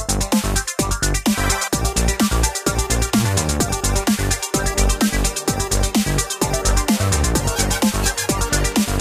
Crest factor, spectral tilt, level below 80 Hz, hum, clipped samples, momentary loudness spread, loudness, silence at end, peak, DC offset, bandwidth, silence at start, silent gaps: 16 dB; -3.5 dB/octave; -24 dBFS; none; under 0.1%; 2 LU; -19 LUFS; 0 s; -2 dBFS; under 0.1%; 16 kHz; 0 s; none